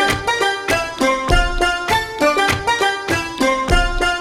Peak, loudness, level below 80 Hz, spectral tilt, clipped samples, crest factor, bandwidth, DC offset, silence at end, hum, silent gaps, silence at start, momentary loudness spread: 0 dBFS; -17 LUFS; -26 dBFS; -3.5 dB/octave; under 0.1%; 16 dB; 16 kHz; under 0.1%; 0 s; none; none; 0 s; 3 LU